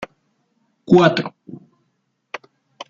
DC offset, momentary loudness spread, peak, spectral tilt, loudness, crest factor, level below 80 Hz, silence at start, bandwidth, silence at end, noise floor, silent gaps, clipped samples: under 0.1%; 26 LU; -2 dBFS; -7 dB/octave; -15 LUFS; 20 dB; -62 dBFS; 0 s; 7.2 kHz; 0.05 s; -70 dBFS; none; under 0.1%